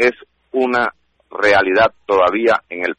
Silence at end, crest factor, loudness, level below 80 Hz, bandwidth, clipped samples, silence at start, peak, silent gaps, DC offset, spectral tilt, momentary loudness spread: 0.05 s; 14 dB; -16 LUFS; -54 dBFS; 9.4 kHz; under 0.1%; 0 s; -4 dBFS; none; under 0.1%; -4.5 dB/octave; 9 LU